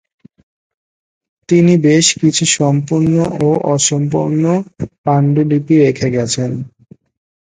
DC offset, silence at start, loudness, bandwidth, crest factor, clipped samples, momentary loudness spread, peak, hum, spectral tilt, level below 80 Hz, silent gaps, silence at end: under 0.1%; 1.5 s; -13 LUFS; 9.6 kHz; 14 dB; under 0.1%; 8 LU; 0 dBFS; none; -5 dB/octave; -50 dBFS; 4.98-5.04 s; 0.9 s